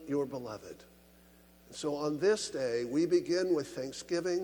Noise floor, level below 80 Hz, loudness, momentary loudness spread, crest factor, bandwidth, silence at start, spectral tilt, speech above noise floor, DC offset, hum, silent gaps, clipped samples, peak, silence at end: -60 dBFS; -68 dBFS; -33 LUFS; 16 LU; 16 dB; 19.5 kHz; 0 s; -4.5 dB/octave; 28 dB; under 0.1%; none; none; under 0.1%; -16 dBFS; 0 s